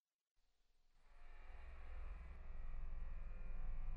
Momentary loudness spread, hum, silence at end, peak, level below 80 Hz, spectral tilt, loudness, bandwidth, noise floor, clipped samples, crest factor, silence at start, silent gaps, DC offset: 8 LU; none; 0 s; -36 dBFS; -48 dBFS; -7.5 dB/octave; -57 LUFS; 3 kHz; -78 dBFS; under 0.1%; 12 dB; 0.95 s; none; under 0.1%